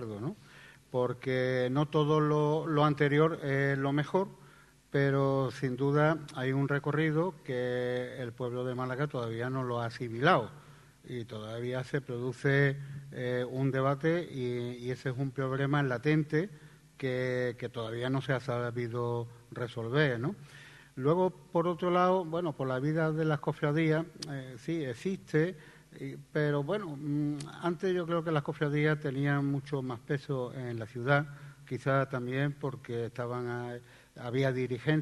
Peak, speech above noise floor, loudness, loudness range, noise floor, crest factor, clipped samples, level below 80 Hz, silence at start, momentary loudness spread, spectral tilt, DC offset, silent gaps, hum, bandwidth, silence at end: -10 dBFS; 27 dB; -32 LUFS; 5 LU; -58 dBFS; 22 dB; under 0.1%; -66 dBFS; 0 s; 12 LU; -7.5 dB/octave; under 0.1%; none; none; 12 kHz; 0 s